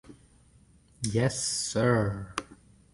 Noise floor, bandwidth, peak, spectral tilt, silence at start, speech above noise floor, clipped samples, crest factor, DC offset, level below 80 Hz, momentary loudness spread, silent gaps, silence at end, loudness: -60 dBFS; 11.5 kHz; -10 dBFS; -4.5 dB/octave; 0.1 s; 32 dB; under 0.1%; 20 dB; under 0.1%; -54 dBFS; 12 LU; none; 0.4 s; -29 LUFS